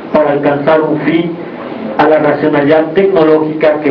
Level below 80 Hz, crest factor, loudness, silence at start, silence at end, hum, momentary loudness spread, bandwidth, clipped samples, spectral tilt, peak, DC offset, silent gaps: -50 dBFS; 10 dB; -10 LUFS; 0 s; 0 s; none; 10 LU; 5.4 kHz; under 0.1%; -9 dB/octave; 0 dBFS; under 0.1%; none